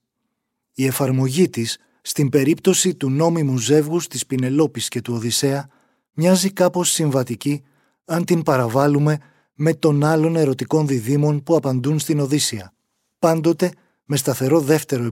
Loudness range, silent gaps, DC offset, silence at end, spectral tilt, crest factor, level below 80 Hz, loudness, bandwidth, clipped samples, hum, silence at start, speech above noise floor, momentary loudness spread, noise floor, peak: 2 LU; none; under 0.1%; 0 s; -5.5 dB/octave; 16 dB; -64 dBFS; -19 LUFS; 17 kHz; under 0.1%; none; 0.8 s; 58 dB; 8 LU; -76 dBFS; -4 dBFS